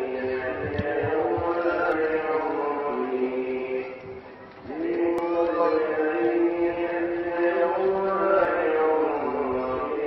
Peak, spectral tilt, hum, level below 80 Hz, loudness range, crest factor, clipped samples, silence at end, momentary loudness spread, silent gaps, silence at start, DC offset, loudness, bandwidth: -10 dBFS; -8.5 dB/octave; none; -54 dBFS; 4 LU; 16 dB; under 0.1%; 0 s; 7 LU; none; 0 s; under 0.1%; -25 LUFS; 5.8 kHz